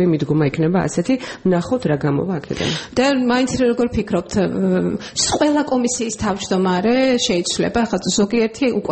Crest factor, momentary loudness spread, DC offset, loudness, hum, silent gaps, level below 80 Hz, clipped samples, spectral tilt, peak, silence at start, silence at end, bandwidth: 14 dB; 5 LU; under 0.1%; -18 LUFS; none; none; -44 dBFS; under 0.1%; -5 dB/octave; -4 dBFS; 0 s; 0 s; 8.8 kHz